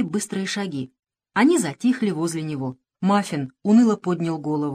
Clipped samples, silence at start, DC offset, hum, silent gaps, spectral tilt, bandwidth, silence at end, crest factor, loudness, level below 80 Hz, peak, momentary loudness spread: under 0.1%; 0 s; under 0.1%; none; 0.99-1.03 s; -5.5 dB/octave; 14.5 kHz; 0 s; 18 dB; -22 LUFS; -68 dBFS; -4 dBFS; 12 LU